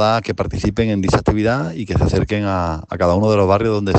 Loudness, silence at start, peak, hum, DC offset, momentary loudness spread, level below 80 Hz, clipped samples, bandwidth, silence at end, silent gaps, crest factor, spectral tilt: -17 LUFS; 0 s; -2 dBFS; none; under 0.1%; 7 LU; -32 dBFS; under 0.1%; 8.6 kHz; 0 s; none; 14 dB; -7 dB/octave